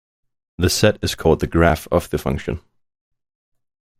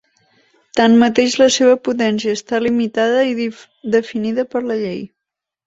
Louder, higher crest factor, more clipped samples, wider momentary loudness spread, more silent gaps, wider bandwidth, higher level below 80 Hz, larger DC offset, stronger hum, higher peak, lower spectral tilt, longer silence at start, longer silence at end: second, -19 LUFS vs -16 LUFS; about the same, 20 dB vs 16 dB; neither; second, 9 LU vs 12 LU; neither; first, 16 kHz vs 8 kHz; first, -36 dBFS vs -58 dBFS; neither; neither; about the same, -2 dBFS vs -2 dBFS; about the same, -5 dB/octave vs -4 dB/octave; second, 0.6 s vs 0.75 s; first, 1.4 s vs 0.6 s